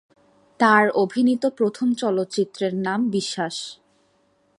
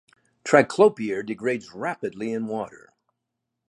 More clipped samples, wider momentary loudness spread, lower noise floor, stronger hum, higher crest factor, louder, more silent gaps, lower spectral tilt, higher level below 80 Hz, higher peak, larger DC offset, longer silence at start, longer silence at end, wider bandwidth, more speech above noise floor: neither; second, 10 LU vs 13 LU; second, -64 dBFS vs -82 dBFS; neither; about the same, 20 dB vs 24 dB; about the same, -21 LUFS vs -23 LUFS; neither; about the same, -5 dB/octave vs -5.5 dB/octave; about the same, -70 dBFS vs -70 dBFS; about the same, -2 dBFS vs -2 dBFS; neither; first, 0.6 s vs 0.45 s; about the same, 0.85 s vs 0.95 s; about the same, 11 kHz vs 11 kHz; second, 43 dB vs 59 dB